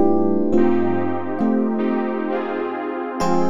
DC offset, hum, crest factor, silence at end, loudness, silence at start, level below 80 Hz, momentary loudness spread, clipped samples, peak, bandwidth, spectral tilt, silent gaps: under 0.1%; none; 14 dB; 0 s; -21 LUFS; 0 s; -52 dBFS; 7 LU; under 0.1%; -4 dBFS; 11.5 kHz; -7.5 dB/octave; none